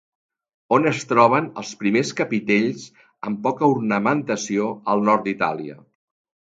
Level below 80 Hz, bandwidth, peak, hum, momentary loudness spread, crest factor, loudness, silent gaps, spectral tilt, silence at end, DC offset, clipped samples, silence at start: -66 dBFS; 9 kHz; -2 dBFS; none; 12 LU; 20 dB; -21 LUFS; none; -5.5 dB/octave; 0.75 s; under 0.1%; under 0.1%; 0.7 s